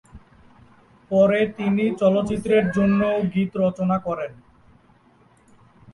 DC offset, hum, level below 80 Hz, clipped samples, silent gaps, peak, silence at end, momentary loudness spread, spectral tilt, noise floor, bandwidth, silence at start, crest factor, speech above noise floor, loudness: under 0.1%; none; -52 dBFS; under 0.1%; none; -6 dBFS; 1.6 s; 6 LU; -8 dB/octave; -56 dBFS; 11.5 kHz; 0.15 s; 18 dB; 36 dB; -21 LUFS